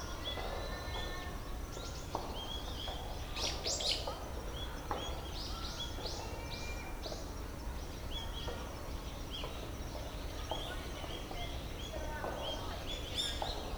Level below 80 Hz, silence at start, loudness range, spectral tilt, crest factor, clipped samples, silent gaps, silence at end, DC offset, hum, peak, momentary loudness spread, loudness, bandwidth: -46 dBFS; 0 s; 5 LU; -3.5 dB/octave; 20 dB; under 0.1%; none; 0 s; under 0.1%; none; -20 dBFS; 8 LU; -41 LUFS; over 20 kHz